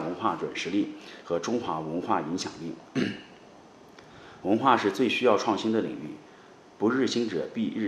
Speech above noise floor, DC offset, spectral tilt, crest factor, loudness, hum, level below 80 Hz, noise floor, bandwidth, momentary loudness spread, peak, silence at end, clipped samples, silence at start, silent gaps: 25 dB; under 0.1%; -5 dB/octave; 22 dB; -28 LUFS; none; -70 dBFS; -52 dBFS; 13 kHz; 16 LU; -6 dBFS; 0 s; under 0.1%; 0 s; none